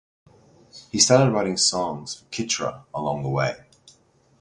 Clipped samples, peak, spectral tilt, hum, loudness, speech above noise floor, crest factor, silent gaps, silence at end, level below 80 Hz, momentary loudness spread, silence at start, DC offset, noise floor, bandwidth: under 0.1%; -2 dBFS; -3.5 dB/octave; none; -22 LUFS; 37 dB; 22 dB; none; 0.85 s; -58 dBFS; 15 LU; 0.75 s; under 0.1%; -59 dBFS; 11.5 kHz